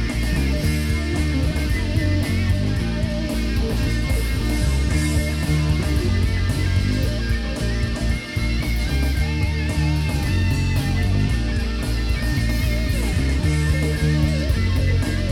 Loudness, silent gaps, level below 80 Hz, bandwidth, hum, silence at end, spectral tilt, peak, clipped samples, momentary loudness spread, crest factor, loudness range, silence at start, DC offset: -22 LUFS; none; -24 dBFS; 16.5 kHz; none; 0 s; -6 dB/octave; -6 dBFS; under 0.1%; 3 LU; 12 dB; 1 LU; 0 s; under 0.1%